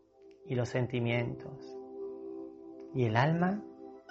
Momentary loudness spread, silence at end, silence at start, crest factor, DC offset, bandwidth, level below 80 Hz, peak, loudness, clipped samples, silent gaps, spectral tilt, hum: 18 LU; 0 s; 0.2 s; 22 dB; under 0.1%; 7.6 kHz; -66 dBFS; -12 dBFS; -33 LUFS; under 0.1%; none; -6 dB/octave; none